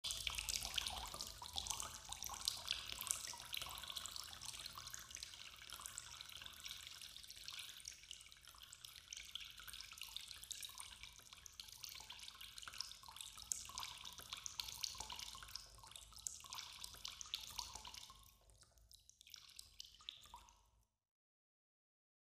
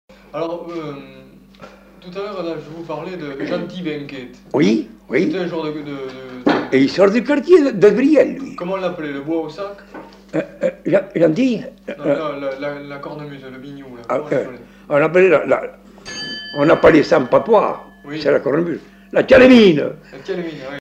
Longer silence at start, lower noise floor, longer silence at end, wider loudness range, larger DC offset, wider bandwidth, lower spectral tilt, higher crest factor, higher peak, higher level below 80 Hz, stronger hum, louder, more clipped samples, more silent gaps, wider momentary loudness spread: second, 0.05 s vs 0.35 s; first, -78 dBFS vs -42 dBFS; first, 1.4 s vs 0 s; about the same, 8 LU vs 10 LU; neither; first, 15.5 kHz vs 9 kHz; second, 0.5 dB/octave vs -6.5 dB/octave; first, 38 dB vs 16 dB; second, -14 dBFS vs -2 dBFS; second, -68 dBFS vs -50 dBFS; neither; second, -49 LUFS vs -16 LUFS; neither; neither; second, 14 LU vs 19 LU